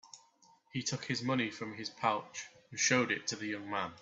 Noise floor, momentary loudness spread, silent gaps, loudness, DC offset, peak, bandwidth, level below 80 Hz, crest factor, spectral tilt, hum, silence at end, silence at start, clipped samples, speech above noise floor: -66 dBFS; 13 LU; none; -35 LUFS; under 0.1%; -14 dBFS; 8.2 kHz; -76 dBFS; 22 dB; -3 dB/octave; none; 0 s; 0.05 s; under 0.1%; 31 dB